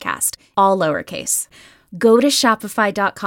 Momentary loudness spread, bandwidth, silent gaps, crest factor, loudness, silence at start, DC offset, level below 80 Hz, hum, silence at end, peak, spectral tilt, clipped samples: 7 LU; 17 kHz; none; 16 dB; -17 LUFS; 0 s; under 0.1%; -58 dBFS; none; 0 s; -2 dBFS; -3 dB/octave; under 0.1%